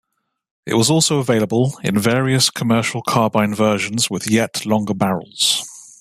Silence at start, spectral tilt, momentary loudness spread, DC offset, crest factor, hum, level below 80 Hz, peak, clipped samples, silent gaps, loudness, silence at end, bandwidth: 0.65 s; -4 dB/octave; 5 LU; under 0.1%; 16 dB; none; -56 dBFS; -2 dBFS; under 0.1%; none; -17 LUFS; 0.15 s; 15.5 kHz